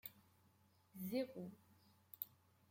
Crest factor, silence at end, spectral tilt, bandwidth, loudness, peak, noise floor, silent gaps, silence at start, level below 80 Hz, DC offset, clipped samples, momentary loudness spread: 26 dB; 0.4 s; -6 dB/octave; 16.5 kHz; -49 LUFS; -26 dBFS; -75 dBFS; none; 0.05 s; under -90 dBFS; under 0.1%; under 0.1%; 19 LU